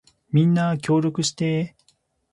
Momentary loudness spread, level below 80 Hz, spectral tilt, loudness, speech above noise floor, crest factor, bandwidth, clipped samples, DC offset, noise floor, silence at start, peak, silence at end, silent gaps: 6 LU; -62 dBFS; -6 dB/octave; -22 LUFS; 45 dB; 14 dB; 11.5 kHz; under 0.1%; under 0.1%; -65 dBFS; 0.35 s; -8 dBFS; 0.65 s; none